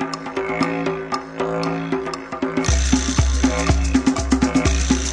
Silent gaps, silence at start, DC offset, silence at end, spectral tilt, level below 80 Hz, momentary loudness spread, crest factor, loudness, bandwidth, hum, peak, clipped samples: none; 0 s; under 0.1%; 0 s; -5 dB/octave; -24 dBFS; 8 LU; 18 dB; -20 LUFS; 10.5 kHz; none; -2 dBFS; under 0.1%